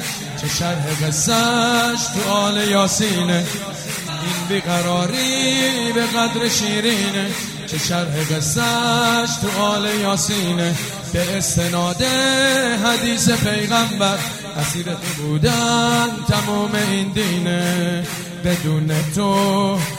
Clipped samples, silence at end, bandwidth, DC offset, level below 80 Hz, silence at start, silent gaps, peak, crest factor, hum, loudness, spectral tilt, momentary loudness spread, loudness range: under 0.1%; 0 s; 16 kHz; under 0.1%; -46 dBFS; 0 s; none; -2 dBFS; 16 dB; none; -18 LUFS; -3.5 dB/octave; 7 LU; 2 LU